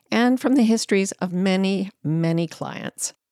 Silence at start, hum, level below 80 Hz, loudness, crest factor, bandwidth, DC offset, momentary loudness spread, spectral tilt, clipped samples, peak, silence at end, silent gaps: 0.1 s; none; -72 dBFS; -22 LUFS; 16 dB; 14.5 kHz; under 0.1%; 10 LU; -5 dB/octave; under 0.1%; -6 dBFS; 0.2 s; none